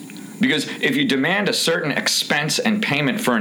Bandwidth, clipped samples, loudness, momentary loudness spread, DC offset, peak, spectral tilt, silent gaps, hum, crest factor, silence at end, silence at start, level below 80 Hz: over 20 kHz; under 0.1%; -19 LUFS; 2 LU; under 0.1%; -6 dBFS; -3.5 dB/octave; none; none; 14 dB; 0 s; 0 s; -66 dBFS